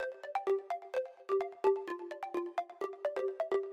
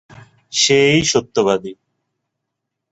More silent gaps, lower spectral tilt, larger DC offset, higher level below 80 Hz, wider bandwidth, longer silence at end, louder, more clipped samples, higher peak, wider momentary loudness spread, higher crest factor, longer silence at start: neither; about the same, -4 dB/octave vs -3 dB/octave; neither; second, -86 dBFS vs -52 dBFS; about the same, 8.8 kHz vs 8.2 kHz; second, 0 s vs 1.2 s; second, -37 LUFS vs -15 LUFS; neither; second, -18 dBFS vs -2 dBFS; about the same, 8 LU vs 10 LU; about the same, 18 dB vs 18 dB; second, 0 s vs 0.5 s